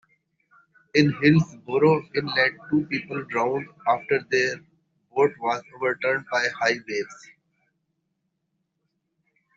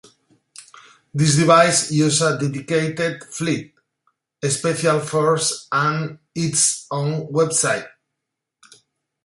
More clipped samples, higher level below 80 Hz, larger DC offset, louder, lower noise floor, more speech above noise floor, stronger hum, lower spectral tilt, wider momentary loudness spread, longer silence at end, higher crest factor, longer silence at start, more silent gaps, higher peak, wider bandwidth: neither; about the same, -64 dBFS vs -60 dBFS; neither; second, -24 LUFS vs -19 LUFS; second, -77 dBFS vs -81 dBFS; second, 53 dB vs 62 dB; neither; about the same, -4.5 dB/octave vs -4 dB/octave; second, 9 LU vs 12 LU; first, 2.4 s vs 1.35 s; about the same, 20 dB vs 20 dB; first, 0.95 s vs 0.6 s; neither; about the same, -4 dBFS vs -2 dBFS; second, 7.6 kHz vs 11.5 kHz